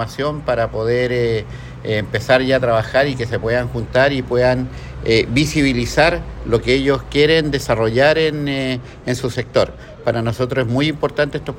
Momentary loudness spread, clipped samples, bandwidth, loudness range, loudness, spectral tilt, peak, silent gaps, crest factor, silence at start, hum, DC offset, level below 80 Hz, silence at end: 8 LU; under 0.1%; 16.5 kHz; 3 LU; -17 LUFS; -5.5 dB/octave; 0 dBFS; none; 16 dB; 0 s; none; under 0.1%; -36 dBFS; 0 s